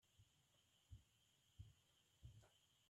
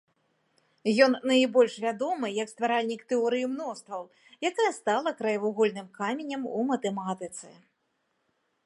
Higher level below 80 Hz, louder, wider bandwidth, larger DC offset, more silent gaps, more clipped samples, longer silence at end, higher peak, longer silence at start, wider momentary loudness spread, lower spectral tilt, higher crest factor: first, -76 dBFS vs -82 dBFS; second, -68 LUFS vs -28 LUFS; about the same, 12.5 kHz vs 11.5 kHz; neither; neither; neither; second, 0 s vs 1.15 s; second, -48 dBFS vs -8 dBFS; second, 0 s vs 0.85 s; second, 1 LU vs 13 LU; about the same, -4.5 dB/octave vs -4 dB/octave; about the same, 20 dB vs 22 dB